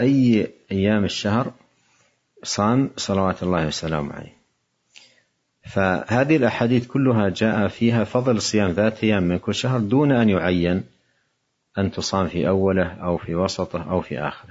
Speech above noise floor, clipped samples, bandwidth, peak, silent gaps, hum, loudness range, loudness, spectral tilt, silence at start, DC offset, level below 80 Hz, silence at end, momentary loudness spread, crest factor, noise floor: 52 dB; under 0.1%; 8 kHz; -4 dBFS; none; none; 5 LU; -21 LUFS; -6 dB/octave; 0 s; under 0.1%; -54 dBFS; 0.1 s; 9 LU; 18 dB; -72 dBFS